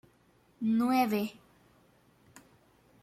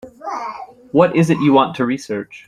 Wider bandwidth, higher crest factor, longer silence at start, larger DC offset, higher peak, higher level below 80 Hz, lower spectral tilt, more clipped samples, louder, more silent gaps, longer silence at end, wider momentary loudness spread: first, 15 kHz vs 12.5 kHz; about the same, 20 dB vs 16 dB; first, 0.6 s vs 0.05 s; neither; second, -14 dBFS vs -2 dBFS; second, -74 dBFS vs -56 dBFS; about the same, -6 dB/octave vs -7 dB/octave; neither; second, -30 LUFS vs -17 LUFS; neither; first, 1.7 s vs 0.1 s; second, 9 LU vs 15 LU